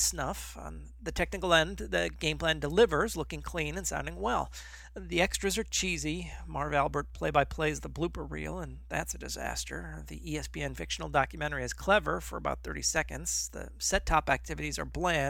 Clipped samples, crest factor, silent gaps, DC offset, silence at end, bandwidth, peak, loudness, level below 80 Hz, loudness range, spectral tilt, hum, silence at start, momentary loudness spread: under 0.1%; 22 dB; none; under 0.1%; 0 s; 17.5 kHz; -10 dBFS; -32 LUFS; -44 dBFS; 5 LU; -3 dB/octave; none; 0 s; 12 LU